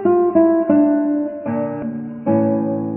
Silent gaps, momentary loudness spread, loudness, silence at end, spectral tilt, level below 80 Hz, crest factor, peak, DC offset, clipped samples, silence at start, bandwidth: none; 10 LU; -17 LUFS; 0 s; -13.5 dB/octave; -58 dBFS; 14 dB; -2 dBFS; under 0.1%; under 0.1%; 0 s; 3 kHz